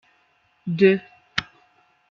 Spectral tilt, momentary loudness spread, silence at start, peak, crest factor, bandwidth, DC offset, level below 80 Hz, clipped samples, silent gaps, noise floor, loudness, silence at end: -6.5 dB/octave; 12 LU; 0.65 s; -2 dBFS; 24 dB; 7 kHz; under 0.1%; -64 dBFS; under 0.1%; none; -64 dBFS; -22 LUFS; 0.7 s